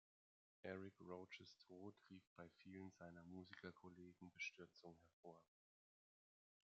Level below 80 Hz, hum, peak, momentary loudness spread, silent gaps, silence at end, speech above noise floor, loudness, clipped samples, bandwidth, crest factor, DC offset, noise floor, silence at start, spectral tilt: under -90 dBFS; none; -38 dBFS; 14 LU; 2.27-2.36 s, 5.13-5.23 s; 1.35 s; over 30 dB; -60 LUFS; under 0.1%; 7.4 kHz; 24 dB; under 0.1%; under -90 dBFS; 0.65 s; -4 dB/octave